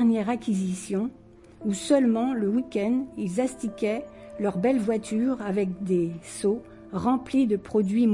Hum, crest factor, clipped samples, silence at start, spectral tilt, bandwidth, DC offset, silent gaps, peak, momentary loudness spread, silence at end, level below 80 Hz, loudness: none; 16 dB; under 0.1%; 0 s; -6.5 dB/octave; 11.5 kHz; under 0.1%; none; -10 dBFS; 8 LU; 0 s; -58 dBFS; -26 LUFS